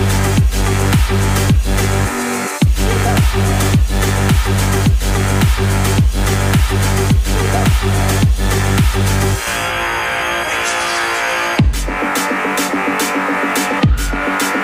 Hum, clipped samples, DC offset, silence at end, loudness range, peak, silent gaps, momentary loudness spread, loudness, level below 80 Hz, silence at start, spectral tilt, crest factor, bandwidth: none; under 0.1%; under 0.1%; 0 s; 2 LU; -2 dBFS; none; 3 LU; -15 LUFS; -20 dBFS; 0 s; -4.5 dB/octave; 12 dB; 16 kHz